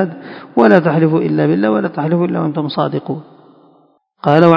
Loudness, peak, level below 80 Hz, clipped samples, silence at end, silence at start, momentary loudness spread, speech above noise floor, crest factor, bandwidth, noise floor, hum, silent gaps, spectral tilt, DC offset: -14 LUFS; 0 dBFS; -62 dBFS; 0.3%; 0 s; 0 s; 12 LU; 40 dB; 14 dB; 6 kHz; -53 dBFS; none; none; -9.5 dB/octave; under 0.1%